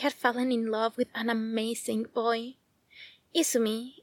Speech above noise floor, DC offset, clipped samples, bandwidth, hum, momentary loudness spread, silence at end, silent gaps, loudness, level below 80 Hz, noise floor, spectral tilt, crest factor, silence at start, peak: 25 dB; under 0.1%; under 0.1%; 19 kHz; none; 13 LU; 0.1 s; none; -29 LUFS; -80 dBFS; -54 dBFS; -3 dB/octave; 20 dB; 0 s; -10 dBFS